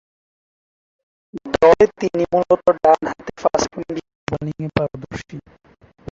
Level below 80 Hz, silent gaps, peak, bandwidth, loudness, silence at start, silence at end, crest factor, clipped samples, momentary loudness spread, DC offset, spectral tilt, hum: -48 dBFS; 4.15-4.27 s; -2 dBFS; 7.6 kHz; -18 LUFS; 1.35 s; 0.7 s; 18 dB; under 0.1%; 19 LU; under 0.1%; -5.5 dB/octave; none